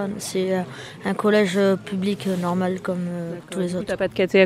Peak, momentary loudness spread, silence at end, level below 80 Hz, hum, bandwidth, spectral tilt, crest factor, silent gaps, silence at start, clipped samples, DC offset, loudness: -4 dBFS; 10 LU; 0 s; -58 dBFS; none; 15 kHz; -6 dB/octave; 18 dB; none; 0 s; under 0.1%; under 0.1%; -23 LUFS